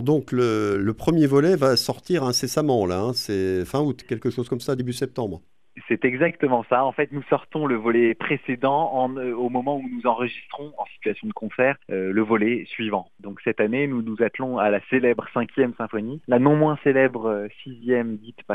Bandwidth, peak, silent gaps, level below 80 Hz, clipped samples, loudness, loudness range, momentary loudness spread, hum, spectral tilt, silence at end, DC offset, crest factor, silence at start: 14.5 kHz; -4 dBFS; none; -56 dBFS; under 0.1%; -23 LUFS; 4 LU; 10 LU; none; -6 dB/octave; 0 s; 0.2%; 18 dB; 0 s